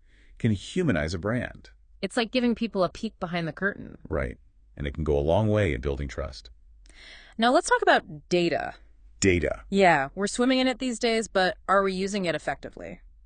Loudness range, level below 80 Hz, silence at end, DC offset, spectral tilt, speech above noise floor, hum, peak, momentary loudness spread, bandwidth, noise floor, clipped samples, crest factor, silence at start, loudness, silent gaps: 5 LU; -44 dBFS; 0.15 s; under 0.1%; -5 dB/octave; 25 dB; none; -8 dBFS; 15 LU; 10.5 kHz; -51 dBFS; under 0.1%; 20 dB; 0.4 s; -26 LUFS; none